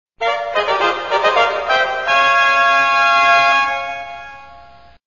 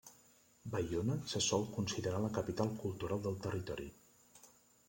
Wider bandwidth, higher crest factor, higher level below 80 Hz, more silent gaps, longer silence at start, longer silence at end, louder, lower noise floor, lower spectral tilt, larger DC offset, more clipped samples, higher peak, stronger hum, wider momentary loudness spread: second, 7.4 kHz vs 16.5 kHz; about the same, 16 dB vs 20 dB; first, -52 dBFS vs -64 dBFS; neither; first, 0.2 s vs 0.05 s; about the same, 0.45 s vs 0.4 s; first, -14 LUFS vs -39 LUFS; second, -43 dBFS vs -67 dBFS; second, -1.5 dB/octave vs -5 dB/octave; first, 0.4% vs under 0.1%; neither; first, 0 dBFS vs -20 dBFS; neither; about the same, 11 LU vs 11 LU